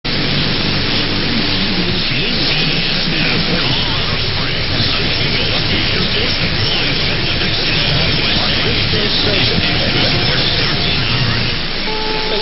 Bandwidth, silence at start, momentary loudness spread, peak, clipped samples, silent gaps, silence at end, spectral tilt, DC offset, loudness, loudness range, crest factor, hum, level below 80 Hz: 5.8 kHz; 0.05 s; 3 LU; 0 dBFS; under 0.1%; none; 0 s; -7.5 dB/octave; under 0.1%; -14 LUFS; 1 LU; 14 dB; none; -24 dBFS